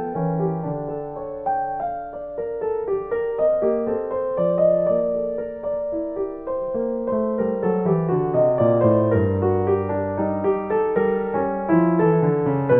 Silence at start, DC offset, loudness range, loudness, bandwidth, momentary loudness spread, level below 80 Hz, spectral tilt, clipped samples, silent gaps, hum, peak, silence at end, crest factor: 0 s; under 0.1%; 4 LU; -22 LUFS; 3.5 kHz; 10 LU; -52 dBFS; -13.5 dB/octave; under 0.1%; none; none; -6 dBFS; 0 s; 16 dB